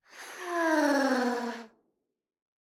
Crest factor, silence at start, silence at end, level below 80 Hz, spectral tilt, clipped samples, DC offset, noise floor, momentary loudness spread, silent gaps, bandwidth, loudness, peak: 18 dB; 0.15 s; 1 s; -86 dBFS; -2.5 dB/octave; under 0.1%; under 0.1%; -79 dBFS; 17 LU; none; 16 kHz; -28 LUFS; -14 dBFS